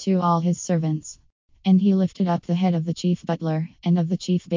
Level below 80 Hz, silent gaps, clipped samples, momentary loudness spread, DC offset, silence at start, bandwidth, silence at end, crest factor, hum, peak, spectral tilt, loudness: -62 dBFS; 1.32-1.48 s; under 0.1%; 7 LU; under 0.1%; 0 s; 7.6 kHz; 0 s; 14 dB; none; -8 dBFS; -7.5 dB/octave; -23 LUFS